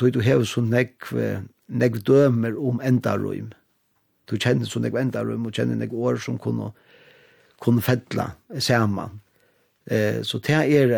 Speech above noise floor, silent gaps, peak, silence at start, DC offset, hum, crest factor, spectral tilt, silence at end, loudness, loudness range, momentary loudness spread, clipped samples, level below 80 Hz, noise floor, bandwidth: 46 dB; none; -6 dBFS; 0 s; under 0.1%; none; 16 dB; -6.5 dB/octave; 0 s; -23 LUFS; 4 LU; 12 LU; under 0.1%; -62 dBFS; -68 dBFS; 19.5 kHz